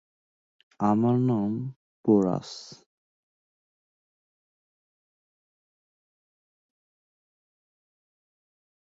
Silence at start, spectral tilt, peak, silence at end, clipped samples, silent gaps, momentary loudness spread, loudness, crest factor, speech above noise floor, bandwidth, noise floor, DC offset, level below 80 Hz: 0.8 s; -8.5 dB/octave; -10 dBFS; 6.25 s; under 0.1%; 1.76-2.04 s; 18 LU; -25 LUFS; 22 dB; over 66 dB; 7.8 kHz; under -90 dBFS; under 0.1%; -68 dBFS